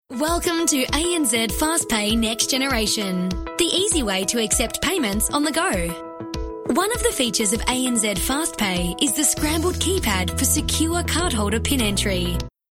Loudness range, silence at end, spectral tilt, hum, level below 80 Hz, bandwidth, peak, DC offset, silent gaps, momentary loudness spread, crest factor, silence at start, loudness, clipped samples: 2 LU; 0.2 s; -3 dB/octave; none; -34 dBFS; 17 kHz; -6 dBFS; under 0.1%; none; 5 LU; 16 dB; 0.1 s; -20 LUFS; under 0.1%